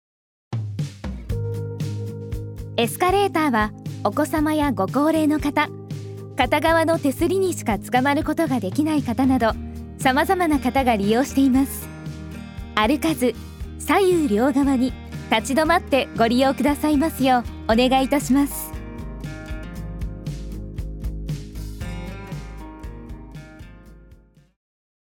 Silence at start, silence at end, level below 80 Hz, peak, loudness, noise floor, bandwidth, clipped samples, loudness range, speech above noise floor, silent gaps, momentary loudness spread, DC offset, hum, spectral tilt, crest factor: 0.5 s; 0.9 s; -38 dBFS; -2 dBFS; -21 LUFS; -51 dBFS; 19.5 kHz; under 0.1%; 13 LU; 31 dB; none; 16 LU; under 0.1%; none; -5.5 dB/octave; 20 dB